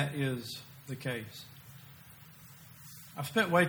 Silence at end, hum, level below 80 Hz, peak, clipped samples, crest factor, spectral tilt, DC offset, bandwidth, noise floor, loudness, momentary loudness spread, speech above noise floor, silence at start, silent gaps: 0 s; none; -70 dBFS; -14 dBFS; under 0.1%; 22 dB; -5 dB/octave; under 0.1%; over 20 kHz; -54 dBFS; -36 LUFS; 20 LU; 22 dB; 0 s; none